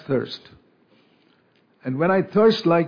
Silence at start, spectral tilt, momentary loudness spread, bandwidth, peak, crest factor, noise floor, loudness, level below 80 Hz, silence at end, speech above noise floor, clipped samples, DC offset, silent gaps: 0.1 s; -7.5 dB/octave; 17 LU; 5.2 kHz; -6 dBFS; 16 dB; -61 dBFS; -20 LUFS; -62 dBFS; 0 s; 41 dB; under 0.1%; under 0.1%; none